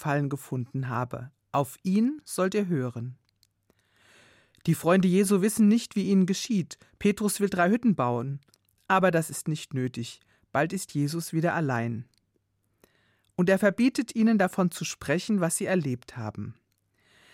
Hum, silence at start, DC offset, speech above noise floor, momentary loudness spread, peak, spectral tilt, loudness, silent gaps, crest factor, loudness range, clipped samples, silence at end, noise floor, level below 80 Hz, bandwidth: none; 0 s; under 0.1%; 48 dB; 14 LU; -10 dBFS; -6 dB/octave; -27 LUFS; none; 18 dB; 6 LU; under 0.1%; 0.8 s; -74 dBFS; -66 dBFS; 16.5 kHz